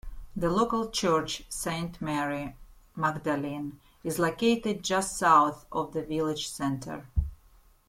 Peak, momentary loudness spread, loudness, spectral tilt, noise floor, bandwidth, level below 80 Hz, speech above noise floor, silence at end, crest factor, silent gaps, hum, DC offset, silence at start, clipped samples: -8 dBFS; 12 LU; -29 LUFS; -4.5 dB/octave; -59 dBFS; 16.5 kHz; -46 dBFS; 30 dB; 0.55 s; 22 dB; none; none; under 0.1%; 0.05 s; under 0.1%